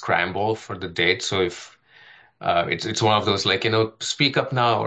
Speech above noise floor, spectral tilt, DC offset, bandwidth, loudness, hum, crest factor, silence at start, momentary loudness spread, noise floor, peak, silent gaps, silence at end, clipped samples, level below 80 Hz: 29 dB; -4 dB/octave; under 0.1%; 9.2 kHz; -22 LUFS; none; 20 dB; 0 s; 8 LU; -51 dBFS; -4 dBFS; none; 0 s; under 0.1%; -58 dBFS